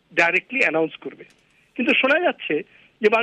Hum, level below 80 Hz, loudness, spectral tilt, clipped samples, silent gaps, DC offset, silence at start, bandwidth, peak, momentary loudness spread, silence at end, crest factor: none; -72 dBFS; -20 LUFS; -4.5 dB/octave; under 0.1%; none; under 0.1%; 0.15 s; 10.5 kHz; -6 dBFS; 16 LU; 0 s; 16 dB